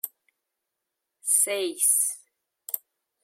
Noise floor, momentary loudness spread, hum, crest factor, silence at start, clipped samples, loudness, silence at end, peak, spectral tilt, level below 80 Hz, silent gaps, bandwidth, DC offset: -84 dBFS; 17 LU; none; 20 dB; 0.05 s; under 0.1%; -23 LUFS; 0.45 s; -8 dBFS; 1 dB/octave; under -90 dBFS; none; 16.5 kHz; under 0.1%